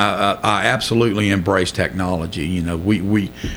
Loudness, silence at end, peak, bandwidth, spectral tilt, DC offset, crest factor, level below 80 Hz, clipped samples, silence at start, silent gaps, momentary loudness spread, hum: -18 LUFS; 0 s; -2 dBFS; over 20 kHz; -5.5 dB/octave; under 0.1%; 16 dB; -38 dBFS; under 0.1%; 0 s; none; 5 LU; none